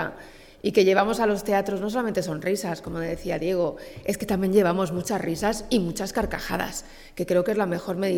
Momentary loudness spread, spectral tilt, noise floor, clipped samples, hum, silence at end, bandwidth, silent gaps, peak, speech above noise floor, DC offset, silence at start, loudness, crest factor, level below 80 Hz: 10 LU; -5.5 dB/octave; -46 dBFS; under 0.1%; none; 0 s; 18 kHz; none; -6 dBFS; 21 dB; under 0.1%; 0 s; -25 LUFS; 18 dB; -46 dBFS